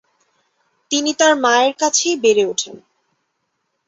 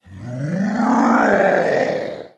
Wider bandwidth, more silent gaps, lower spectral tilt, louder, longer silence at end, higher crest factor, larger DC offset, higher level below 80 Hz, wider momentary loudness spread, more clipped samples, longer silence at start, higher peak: about the same, 8.2 kHz vs 9 kHz; neither; second, -1 dB/octave vs -6.5 dB/octave; about the same, -16 LUFS vs -17 LUFS; first, 1.1 s vs 0.1 s; about the same, 18 dB vs 16 dB; neither; second, -68 dBFS vs -56 dBFS; second, 8 LU vs 11 LU; neither; first, 0.9 s vs 0.1 s; about the same, -2 dBFS vs -2 dBFS